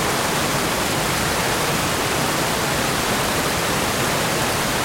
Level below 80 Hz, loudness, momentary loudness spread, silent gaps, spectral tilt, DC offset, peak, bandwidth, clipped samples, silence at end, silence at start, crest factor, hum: -40 dBFS; -20 LUFS; 0 LU; none; -3 dB/octave; under 0.1%; -6 dBFS; 16.5 kHz; under 0.1%; 0 s; 0 s; 14 dB; none